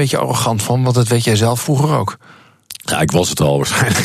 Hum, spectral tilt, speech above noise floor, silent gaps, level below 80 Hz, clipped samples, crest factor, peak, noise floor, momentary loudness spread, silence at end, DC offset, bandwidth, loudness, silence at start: none; -4.5 dB/octave; 22 dB; none; -44 dBFS; under 0.1%; 12 dB; -2 dBFS; -37 dBFS; 6 LU; 0 s; under 0.1%; 14.5 kHz; -15 LUFS; 0 s